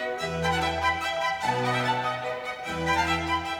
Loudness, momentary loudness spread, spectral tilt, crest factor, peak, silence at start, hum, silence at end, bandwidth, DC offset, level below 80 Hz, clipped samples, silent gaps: -27 LUFS; 6 LU; -4 dB/octave; 16 dB; -12 dBFS; 0 s; none; 0 s; over 20 kHz; under 0.1%; -48 dBFS; under 0.1%; none